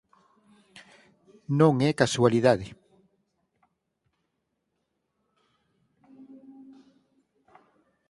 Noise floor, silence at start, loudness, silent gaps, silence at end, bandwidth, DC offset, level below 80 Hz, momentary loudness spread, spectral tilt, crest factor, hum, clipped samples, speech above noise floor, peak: -79 dBFS; 1.5 s; -23 LUFS; none; 5.4 s; 11.5 kHz; under 0.1%; -64 dBFS; 9 LU; -6 dB/octave; 26 dB; none; under 0.1%; 57 dB; -4 dBFS